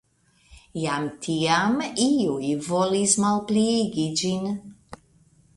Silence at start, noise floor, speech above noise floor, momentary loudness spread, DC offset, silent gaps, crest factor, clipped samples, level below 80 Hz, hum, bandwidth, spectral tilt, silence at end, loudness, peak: 0.5 s; -61 dBFS; 38 dB; 8 LU; under 0.1%; none; 20 dB; under 0.1%; -58 dBFS; none; 11.5 kHz; -4 dB/octave; 0.6 s; -23 LUFS; -4 dBFS